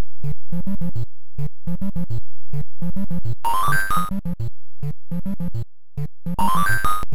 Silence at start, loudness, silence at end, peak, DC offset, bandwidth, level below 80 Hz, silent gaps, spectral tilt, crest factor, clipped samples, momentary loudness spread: 0 s; -26 LUFS; 0 s; -6 dBFS; 20%; 20 kHz; -36 dBFS; none; -5.5 dB/octave; 10 dB; under 0.1%; 13 LU